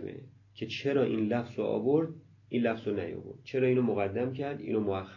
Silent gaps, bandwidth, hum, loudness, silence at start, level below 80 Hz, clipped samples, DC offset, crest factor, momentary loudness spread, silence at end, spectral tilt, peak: none; 7.2 kHz; none; -31 LUFS; 0 s; -62 dBFS; under 0.1%; under 0.1%; 16 dB; 13 LU; 0 s; -8 dB/octave; -16 dBFS